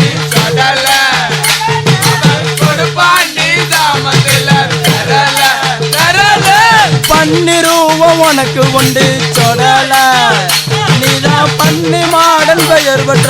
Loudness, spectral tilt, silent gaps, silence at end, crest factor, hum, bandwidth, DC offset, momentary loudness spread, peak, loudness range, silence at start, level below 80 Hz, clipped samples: -7 LUFS; -3.5 dB/octave; none; 0 s; 8 dB; none; over 20 kHz; under 0.1%; 4 LU; 0 dBFS; 2 LU; 0 s; -40 dBFS; 1%